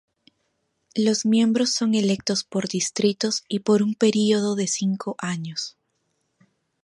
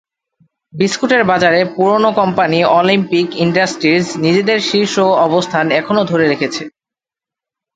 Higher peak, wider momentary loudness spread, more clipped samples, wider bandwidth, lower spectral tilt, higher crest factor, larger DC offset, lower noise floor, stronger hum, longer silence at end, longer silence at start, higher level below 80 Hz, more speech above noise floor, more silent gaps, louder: second, -6 dBFS vs 0 dBFS; first, 9 LU vs 5 LU; neither; first, 11.5 kHz vs 9.4 kHz; about the same, -4.5 dB/octave vs -5 dB/octave; about the same, 18 dB vs 14 dB; neither; second, -73 dBFS vs -88 dBFS; neither; about the same, 1.15 s vs 1.05 s; first, 0.95 s vs 0.75 s; second, -70 dBFS vs -56 dBFS; second, 51 dB vs 75 dB; neither; second, -22 LUFS vs -13 LUFS